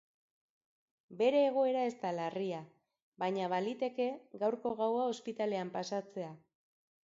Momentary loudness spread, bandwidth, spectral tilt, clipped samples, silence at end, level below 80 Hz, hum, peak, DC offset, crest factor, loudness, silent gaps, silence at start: 10 LU; 7.6 kHz; -4.5 dB/octave; under 0.1%; 0.7 s; -84 dBFS; none; -18 dBFS; under 0.1%; 18 dB; -35 LUFS; 3.02-3.12 s; 1.1 s